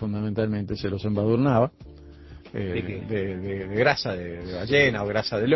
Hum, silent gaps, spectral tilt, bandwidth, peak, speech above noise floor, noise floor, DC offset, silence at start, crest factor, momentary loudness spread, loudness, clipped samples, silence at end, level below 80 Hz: none; none; -7 dB/octave; 6 kHz; -6 dBFS; 20 dB; -45 dBFS; under 0.1%; 0 s; 20 dB; 12 LU; -25 LUFS; under 0.1%; 0 s; -46 dBFS